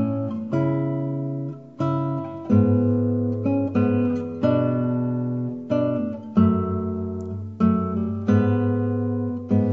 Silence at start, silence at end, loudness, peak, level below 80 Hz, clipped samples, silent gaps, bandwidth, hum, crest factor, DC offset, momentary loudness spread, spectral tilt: 0 s; 0 s; -23 LUFS; -6 dBFS; -58 dBFS; under 0.1%; none; 6.4 kHz; none; 16 dB; 0.1%; 8 LU; -10.5 dB/octave